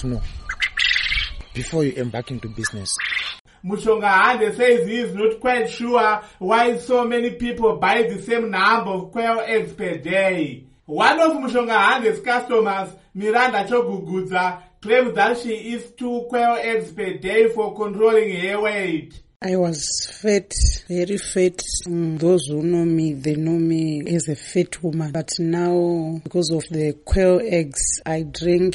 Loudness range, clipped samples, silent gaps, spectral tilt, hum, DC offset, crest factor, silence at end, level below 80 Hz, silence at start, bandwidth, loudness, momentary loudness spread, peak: 3 LU; under 0.1%; 3.40-3.45 s, 19.36-19.40 s; -4.5 dB/octave; none; under 0.1%; 16 dB; 0 s; -36 dBFS; 0 s; 11.5 kHz; -20 LUFS; 10 LU; -4 dBFS